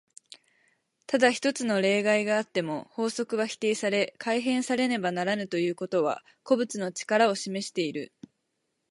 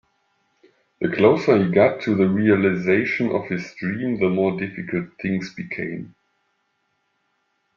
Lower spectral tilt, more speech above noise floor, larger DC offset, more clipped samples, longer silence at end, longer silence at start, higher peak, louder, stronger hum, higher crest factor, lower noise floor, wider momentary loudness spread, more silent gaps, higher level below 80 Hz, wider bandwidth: second, -4 dB/octave vs -8 dB/octave; about the same, 52 dB vs 50 dB; neither; neither; second, 0.85 s vs 1.7 s; about the same, 1.1 s vs 1 s; second, -8 dBFS vs -2 dBFS; second, -27 LUFS vs -21 LUFS; neither; about the same, 20 dB vs 20 dB; first, -79 dBFS vs -71 dBFS; second, 8 LU vs 12 LU; neither; second, -78 dBFS vs -60 dBFS; first, 11.5 kHz vs 7 kHz